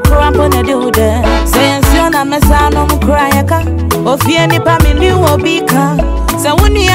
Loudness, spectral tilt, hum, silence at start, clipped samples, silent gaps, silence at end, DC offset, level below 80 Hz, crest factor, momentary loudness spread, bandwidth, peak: -10 LUFS; -5 dB/octave; none; 0 s; under 0.1%; none; 0 s; under 0.1%; -14 dBFS; 8 dB; 4 LU; 16.5 kHz; 0 dBFS